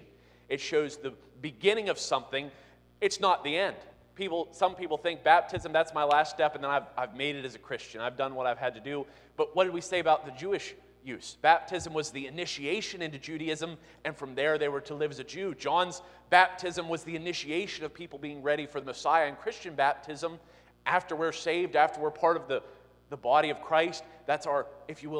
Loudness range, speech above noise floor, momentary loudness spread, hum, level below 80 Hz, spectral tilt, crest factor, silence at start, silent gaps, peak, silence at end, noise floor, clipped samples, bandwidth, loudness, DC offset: 4 LU; 27 dB; 13 LU; 60 Hz at -65 dBFS; -66 dBFS; -3.5 dB/octave; 26 dB; 0 s; none; -6 dBFS; 0 s; -58 dBFS; under 0.1%; 11.5 kHz; -30 LUFS; under 0.1%